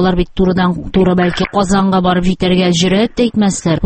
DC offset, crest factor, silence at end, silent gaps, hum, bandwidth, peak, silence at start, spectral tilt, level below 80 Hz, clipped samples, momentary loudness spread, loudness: under 0.1%; 12 dB; 0 s; none; none; 8.8 kHz; 0 dBFS; 0 s; -5.5 dB/octave; -30 dBFS; under 0.1%; 3 LU; -13 LUFS